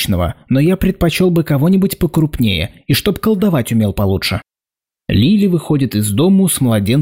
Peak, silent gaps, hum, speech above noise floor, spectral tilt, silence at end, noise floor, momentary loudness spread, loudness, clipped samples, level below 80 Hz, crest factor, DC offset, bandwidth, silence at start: -4 dBFS; none; none; 76 dB; -6 dB/octave; 0 s; -89 dBFS; 5 LU; -14 LUFS; under 0.1%; -34 dBFS; 10 dB; under 0.1%; 16.5 kHz; 0 s